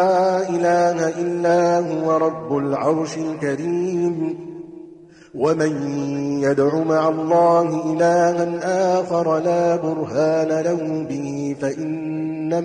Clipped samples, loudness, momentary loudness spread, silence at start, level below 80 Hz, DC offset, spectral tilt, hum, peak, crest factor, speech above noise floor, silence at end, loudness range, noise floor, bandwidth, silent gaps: under 0.1%; -20 LUFS; 9 LU; 0 s; -62 dBFS; under 0.1%; -6.5 dB/octave; none; -6 dBFS; 14 dB; 24 dB; 0 s; 5 LU; -43 dBFS; 9.8 kHz; none